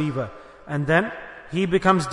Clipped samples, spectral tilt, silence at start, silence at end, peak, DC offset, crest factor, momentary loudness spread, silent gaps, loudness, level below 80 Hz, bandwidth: under 0.1%; -6.5 dB/octave; 0 s; 0 s; -4 dBFS; under 0.1%; 18 dB; 16 LU; none; -23 LUFS; -50 dBFS; 11 kHz